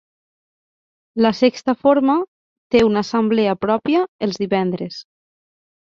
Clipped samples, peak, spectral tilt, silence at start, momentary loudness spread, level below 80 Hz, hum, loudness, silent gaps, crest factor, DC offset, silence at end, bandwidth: under 0.1%; -2 dBFS; -6.5 dB/octave; 1.15 s; 12 LU; -56 dBFS; none; -18 LUFS; 2.28-2.70 s, 4.08-4.19 s; 18 dB; under 0.1%; 0.9 s; 7.4 kHz